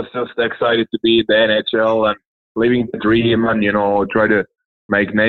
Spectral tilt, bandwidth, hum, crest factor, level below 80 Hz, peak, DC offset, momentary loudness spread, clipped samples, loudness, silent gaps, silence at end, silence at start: -8 dB/octave; 4.4 kHz; none; 14 dB; -48 dBFS; -2 dBFS; under 0.1%; 6 LU; under 0.1%; -16 LUFS; 2.25-2.55 s, 4.65-4.89 s; 0 s; 0 s